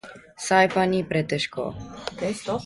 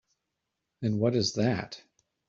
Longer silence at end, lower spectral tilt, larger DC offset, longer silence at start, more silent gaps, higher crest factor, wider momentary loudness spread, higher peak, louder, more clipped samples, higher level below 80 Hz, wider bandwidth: second, 0 s vs 0.5 s; about the same, -4.5 dB/octave vs -5.5 dB/octave; neither; second, 0.05 s vs 0.8 s; neither; about the same, 20 dB vs 18 dB; about the same, 16 LU vs 15 LU; first, -4 dBFS vs -12 dBFS; first, -24 LUFS vs -29 LUFS; neither; first, -54 dBFS vs -66 dBFS; first, 11.5 kHz vs 7.6 kHz